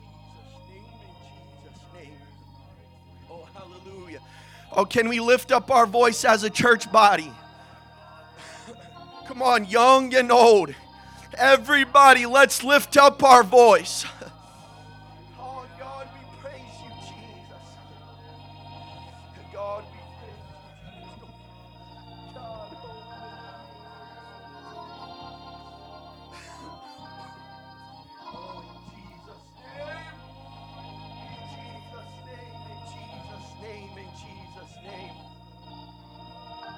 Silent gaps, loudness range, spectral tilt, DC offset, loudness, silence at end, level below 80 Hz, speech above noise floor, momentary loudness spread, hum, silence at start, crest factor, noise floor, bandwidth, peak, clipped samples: none; 27 LU; -3 dB/octave; under 0.1%; -17 LUFS; 0.05 s; -58 dBFS; 32 dB; 29 LU; none; 3.35 s; 22 dB; -50 dBFS; 16.5 kHz; -2 dBFS; under 0.1%